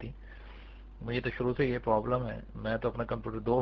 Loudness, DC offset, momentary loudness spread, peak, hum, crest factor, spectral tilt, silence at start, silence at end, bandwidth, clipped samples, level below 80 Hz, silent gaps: -33 LUFS; under 0.1%; 20 LU; -14 dBFS; none; 20 dB; -6 dB/octave; 0 s; 0 s; 6 kHz; under 0.1%; -48 dBFS; none